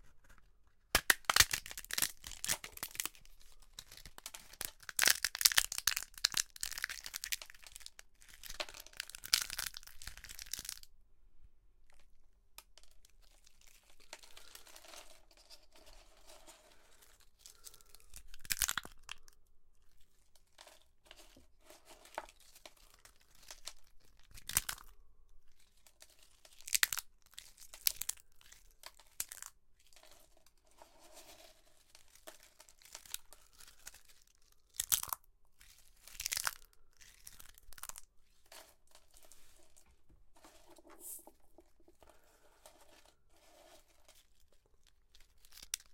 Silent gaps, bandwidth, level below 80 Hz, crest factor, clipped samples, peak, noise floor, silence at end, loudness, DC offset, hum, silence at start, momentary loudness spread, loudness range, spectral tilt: none; 17 kHz; -62 dBFS; 44 dB; under 0.1%; 0 dBFS; -66 dBFS; 0 s; -36 LUFS; under 0.1%; none; 0.05 s; 28 LU; 23 LU; 1 dB/octave